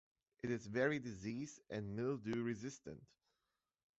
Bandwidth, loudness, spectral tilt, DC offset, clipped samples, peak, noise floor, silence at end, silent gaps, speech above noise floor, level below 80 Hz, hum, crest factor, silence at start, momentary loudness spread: 8 kHz; -43 LUFS; -6 dB/octave; under 0.1%; under 0.1%; -24 dBFS; under -90 dBFS; 0.95 s; none; over 47 dB; -72 dBFS; none; 22 dB; 0.45 s; 13 LU